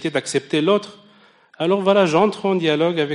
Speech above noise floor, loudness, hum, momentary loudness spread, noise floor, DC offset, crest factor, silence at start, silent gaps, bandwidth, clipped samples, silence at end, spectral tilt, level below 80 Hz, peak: 34 dB; -18 LUFS; none; 6 LU; -52 dBFS; under 0.1%; 16 dB; 0 s; none; 10.5 kHz; under 0.1%; 0 s; -5 dB/octave; -68 dBFS; -4 dBFS